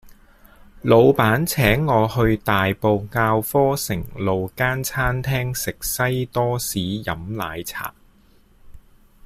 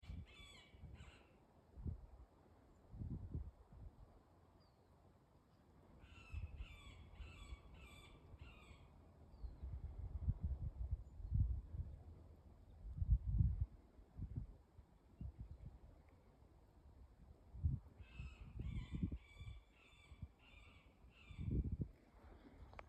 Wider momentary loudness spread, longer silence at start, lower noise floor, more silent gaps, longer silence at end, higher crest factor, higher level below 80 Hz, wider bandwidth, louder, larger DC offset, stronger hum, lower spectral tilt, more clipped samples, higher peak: second, 11 LU vs 22 LU; about the same, 0.05 s vs 0.05 s; second, -54 dBFS vs -71 dBFS; neither; first, 0.45 s vs 0 s; second, 18 dB vs 24 dB; first, -40 dBFS vs -52 dBFS; first, 16 kHz vs 8.6 kHz; first, -20 LUFS vs -49 LUFS; neither; neither; second, -5.5 dB/octave vs -8 dB/octave; neither; first, -2 dBFS vs -24 dBFS